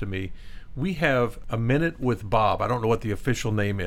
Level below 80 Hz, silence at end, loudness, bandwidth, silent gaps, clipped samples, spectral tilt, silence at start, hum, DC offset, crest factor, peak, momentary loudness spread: -40 dBFS; 0 s; -25 LUFS; 15.5 kHz; none; under 0.1%; -6.5 dB/octave; 0 s; none; under 0.1%; 18 dB; -8 dBFS; 9 LU